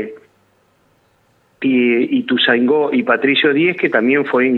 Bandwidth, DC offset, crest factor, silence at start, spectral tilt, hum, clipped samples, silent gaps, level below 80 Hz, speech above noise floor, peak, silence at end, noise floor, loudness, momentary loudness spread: 4.3 kHz; under 0.1%; 16 dB; 0 s; -7.5 dB/octave; none; under 0.1%; none; -68 dBFS; 43 dB; 0 dBFS; 0 s; -58 dBFS; -14 LUFS; 4 LU